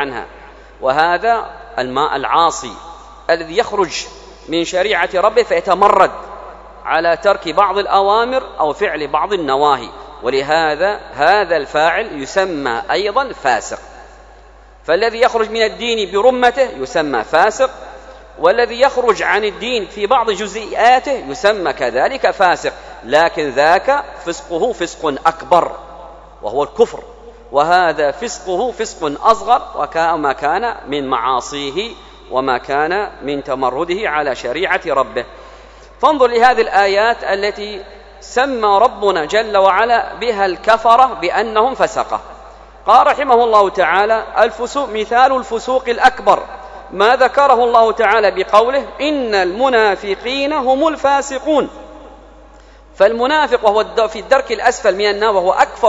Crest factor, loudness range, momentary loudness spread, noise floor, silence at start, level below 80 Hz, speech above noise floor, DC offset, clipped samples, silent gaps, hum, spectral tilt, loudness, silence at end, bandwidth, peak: 14 dB; 5 LU; 10 LU; -41 dBFS; 0 s; -44 dBFS; 27 dB; under 0.1%; 0.2%; none; none; -3.5 dB/octave; -15 LUFS; 0 s; 11 kHz; 0 dBFS